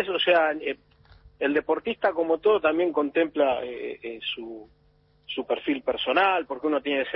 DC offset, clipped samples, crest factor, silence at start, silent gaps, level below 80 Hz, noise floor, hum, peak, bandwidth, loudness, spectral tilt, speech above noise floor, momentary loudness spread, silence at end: under 0.1%; under 0.1%; 18 dB; 0 s; none; -62 dBFS; -62 dBFS; none; -8 dBFS; 5.6 kHz; -25 LUFS; -8 dB/octave; 37 dB; 13 LU; 0 s